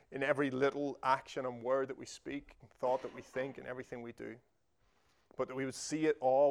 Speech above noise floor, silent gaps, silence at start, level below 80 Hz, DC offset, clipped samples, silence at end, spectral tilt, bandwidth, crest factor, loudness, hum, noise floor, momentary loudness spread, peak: 40 dB; none; 0.1 s; -72 dBFS; under 0.1%; under 0.1%; 0 s; -5 dB/octave; 12.5 kHz; 20 dB; -37 LUFS; none; -76 dBFS; 14 LU; -16 dBFS